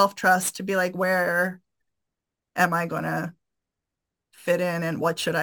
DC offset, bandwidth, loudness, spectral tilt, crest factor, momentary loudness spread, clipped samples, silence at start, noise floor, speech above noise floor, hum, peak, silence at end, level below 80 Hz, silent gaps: under 0.1%; 19 kHz; -24 LUFS; -4 dB/octave; 20 dB; 9 LU; under 0.1%; 0 s; -85 dBFS; 61 dB; none; -6 dBFS; 0 s; -72 dBFS; none